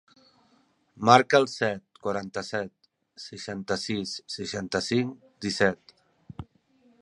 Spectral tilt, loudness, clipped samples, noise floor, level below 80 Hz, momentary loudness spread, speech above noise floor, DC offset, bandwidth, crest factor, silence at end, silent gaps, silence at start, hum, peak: -4.5 dB/octave; -26 LUFS; under 0.1%; -66 dBFS; -60 dBFS; 23 LU; 40 dB; under 0.1%; 11.5 kHz; 26 dB; 0.6 s; none; 0.95 s; none; -2 dBFS